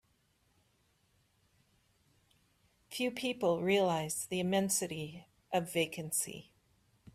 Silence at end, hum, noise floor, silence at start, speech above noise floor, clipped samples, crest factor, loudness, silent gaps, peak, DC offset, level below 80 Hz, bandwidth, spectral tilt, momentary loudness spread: 0.7 s; none; -74 dBFS; 2.9 s; 40 dB; under 0.1%; 20 dB; -34 LUFS; none; -18 dBFS; under 0.1%; -74 dBFS; 15.5 kHz; -3.5 dB/octave; 12 LU